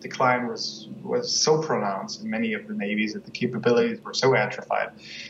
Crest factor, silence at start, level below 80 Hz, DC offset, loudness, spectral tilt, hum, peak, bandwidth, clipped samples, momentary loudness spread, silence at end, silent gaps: 16 dB; 0 s; -70 dBFS; under 0.1%; -25 LUFS; -3.5 dB/octave; none; -8 dBFS; 8 kHz; under 0.1%; 9 LU; 0 s; none